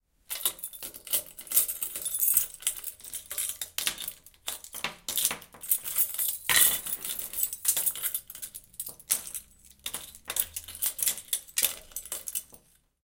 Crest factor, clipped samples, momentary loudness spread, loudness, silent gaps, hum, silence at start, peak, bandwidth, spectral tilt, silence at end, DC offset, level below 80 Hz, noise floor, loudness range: 28 dB; under 0.1%; 15 LU; -28 LUFS; none; none; 0.3 s; -4 dBFS; 17.5 kHz; 1.5 dB/octave; 0.45 s; under 0.1%; -62 dBFS; -59 dBFS; 6 LU